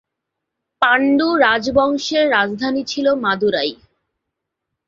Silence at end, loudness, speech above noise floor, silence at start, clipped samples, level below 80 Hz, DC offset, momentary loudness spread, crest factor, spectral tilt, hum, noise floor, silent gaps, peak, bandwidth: 1.15 s; -16 LUFS; 63 dB; 0.8 s; under 0.1%; -52 dBFS; under 0.1%; 6 LU; 18 dB; -4 dB/octave; none; -79 dBFS; none; 0 dBFS; 7.6 kHz